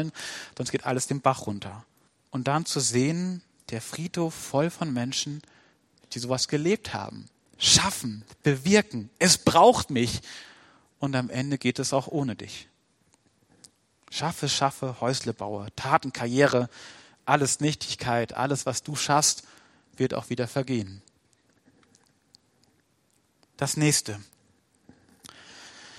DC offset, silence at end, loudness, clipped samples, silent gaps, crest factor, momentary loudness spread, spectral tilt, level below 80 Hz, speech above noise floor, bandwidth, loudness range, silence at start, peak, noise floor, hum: under 0.1%; 0 s; -26 LUFS; under 0.1%; none; 26 dB; 17 LU; -3.5 dB/octave; -60 dBFS; 42 dB; 16 kHz; 8 LU; 0 s; -2 dBFS; -68 dBFS; none